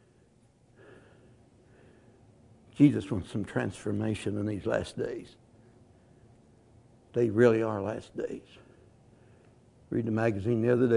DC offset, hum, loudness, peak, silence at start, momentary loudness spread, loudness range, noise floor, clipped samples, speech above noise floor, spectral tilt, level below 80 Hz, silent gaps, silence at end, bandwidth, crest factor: under 0.1%; none; -29 LUFS; -8 dBFS; 0.9 s; 14 LU; 4 LU; -63 dBFS; under 0.1%; 35 dB; -8 dB/octave; -64 dBFS; none; 0 s; 11 kHz; 22 dB